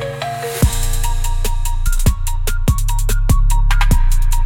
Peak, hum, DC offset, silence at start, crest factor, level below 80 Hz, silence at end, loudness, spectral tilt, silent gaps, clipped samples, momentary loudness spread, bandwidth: -2 dBFS; none; under 0.1%; 0 s; 12 dB; -14 dBFS; 0 s; -19 LUFS; -4.5 dB/octave; none; under 0.1%; 6 LU; 17 kHz